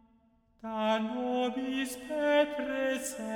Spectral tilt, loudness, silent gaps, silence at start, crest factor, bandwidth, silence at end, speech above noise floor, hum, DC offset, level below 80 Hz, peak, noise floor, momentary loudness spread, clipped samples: -3.5 dB/octave; -31 LUFS; none; 0.65 s; 18 dB; over 20 kHz; 0 s; 36 dB; none; under 0.1%; -66 dBFS; -14 dBFS; -67 dBFS; 8 LU; under 0.1%